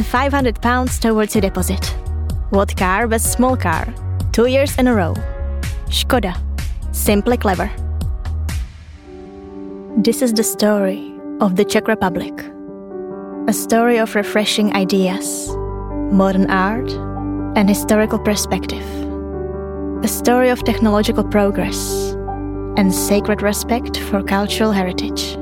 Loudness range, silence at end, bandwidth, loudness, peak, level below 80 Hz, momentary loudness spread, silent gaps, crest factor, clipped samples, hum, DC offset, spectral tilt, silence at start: 3 LU; 0 s; 17.5 kHz; -17 LUFS; -2 dBFS; -28 dBFS; 11 LU; none; 16 dB; under 0.1%; none; under 0.1%; -5 dB/octave; 0 s